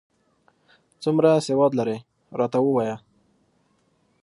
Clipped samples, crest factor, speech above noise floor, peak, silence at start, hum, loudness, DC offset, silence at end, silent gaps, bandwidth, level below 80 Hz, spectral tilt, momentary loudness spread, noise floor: under 0.1%; 20 dB; 45 dB; -4 dBFS; 1 s; none; -22 LUFS; under 0.1%; 1.25 s; none; 11.5 kHz; -70 dBFS; -7 dB/octave; 15 LU; -66 dBFS